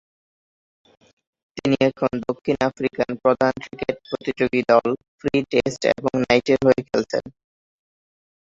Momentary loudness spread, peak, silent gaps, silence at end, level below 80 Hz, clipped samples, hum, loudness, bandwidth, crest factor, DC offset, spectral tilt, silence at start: 10 LU; -2 dBFS; 5.08-5.18 s; 1.2 s; -54 dBFS; under 0.1%; none; -21 LUFS; 7.8 kHz; 20 dB; under 0.1%; -6 dB/octave; 1.55 s